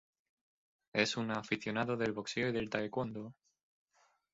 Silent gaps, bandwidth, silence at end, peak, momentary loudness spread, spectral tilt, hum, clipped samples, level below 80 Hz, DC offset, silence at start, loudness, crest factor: none; 7.6 kHz; 1 s; -14 dBFS; 7 LU; -3.5 dB/octave; none; under 0.1%; -70 dBFS; under 0.1%; 0.95 s; -36 LUFS; 24 dB